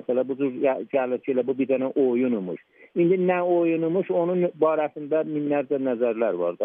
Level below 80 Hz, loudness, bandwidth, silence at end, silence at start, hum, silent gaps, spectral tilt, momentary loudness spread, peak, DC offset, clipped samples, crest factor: -82 dBFS; -24 LUFS; 3.7 kHz; 0 s; 0.1 s; none; none; -11.5 dB/octave; 5 LU; -8 dBFS; under 0.1%; under 0.1%; 14 dB